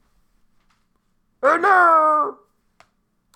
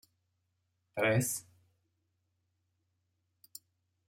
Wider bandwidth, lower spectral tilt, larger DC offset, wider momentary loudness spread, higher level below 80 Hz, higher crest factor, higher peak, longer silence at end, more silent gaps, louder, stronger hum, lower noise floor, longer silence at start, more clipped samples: second, 13 kHz vs 16 kHz; about the same, -3.5 dB/octave vs -4.5 dB/octave; neither; second, 9 LU vs 23 LU; first, -68 dBFS vs -76 dBFS; second, 18 dB vs 24 dB; first, -2 dBFS vs -16 dBFS; second, 1.05 s vs 2.65 s; neither; first, -16 LUFS vs -33 LUFS; first, 60 Hz at -70 dBFS vs none; second, -66 dBFS vs -81 dBFS; first, 1.4 s vs 0.95 s; neither